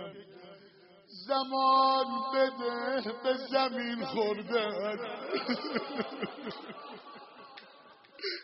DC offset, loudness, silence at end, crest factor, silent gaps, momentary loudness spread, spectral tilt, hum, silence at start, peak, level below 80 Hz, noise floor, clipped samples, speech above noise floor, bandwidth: under 0.1%; -31 LUFS; 0 s; 18 dB; none; 23 LU; -1.5 dB/octave; none; 0 s; -14 dBFS; -82 dBFS; -58 dBFS; under 0.1%; 27 dB; 5.8 kHz